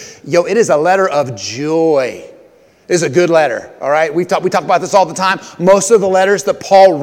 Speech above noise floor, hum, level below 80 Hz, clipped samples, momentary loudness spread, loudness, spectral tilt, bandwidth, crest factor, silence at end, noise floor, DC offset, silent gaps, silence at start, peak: 34 dB; none; -58 dBFS; 0.3%; 8 LU; -12 LUFS; -4.5 dB/octave; 16 kHz; 12 dB; 0 s; -45 dBFS; under 0.1%; none; 0 s; 0 dBFS